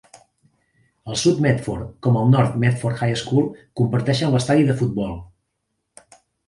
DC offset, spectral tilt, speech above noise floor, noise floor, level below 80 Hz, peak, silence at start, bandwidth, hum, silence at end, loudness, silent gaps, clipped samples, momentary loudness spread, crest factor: under 0.1%; -6.5 dB/octave; 56 dB; -75 dBFS; -48 dBFS; -2 dBFS; 1.05 s; 11.5 kHz; none; 1.2 s; -20 LUFS; none; under 0.1%; 10 LU; 18 dB